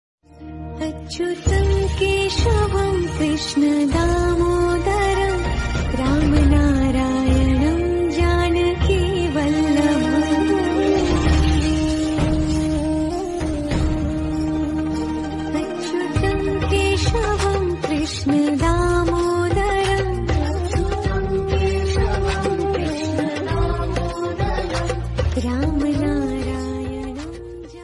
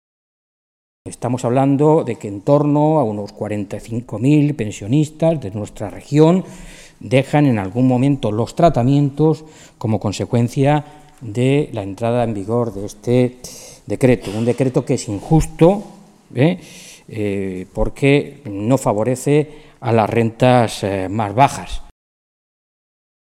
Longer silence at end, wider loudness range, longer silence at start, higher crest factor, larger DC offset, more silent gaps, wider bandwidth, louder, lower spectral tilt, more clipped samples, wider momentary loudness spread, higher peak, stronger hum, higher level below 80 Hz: second, 0 s vs 1.4 s; about the same, 4 LU vs 3 LU; second, 0.35 s vs 1.05 s; about the same, 14 dB vs 18 dB; neither; neither; second, 11.5 kHz vs 14 kHz; second, -20 LUFS vs -17 LUFS; about the same, -6 dB/octave vs -7 dB/octave; neither; second, 7 LU vs 14 LU; second, -6 dBFS vs 0 dBFS; neither; first, -26 dBFS vs -38 dBFS